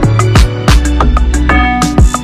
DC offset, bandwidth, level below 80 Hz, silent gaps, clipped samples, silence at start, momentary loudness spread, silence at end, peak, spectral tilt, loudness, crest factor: under 0.1%; 13.5 kHz; -10 dBFS; none; 0.3%; 0 s; 2 LU; 0 s; 0 dBFS; -5.5 dB/octave; -10 LUFS; 8 dB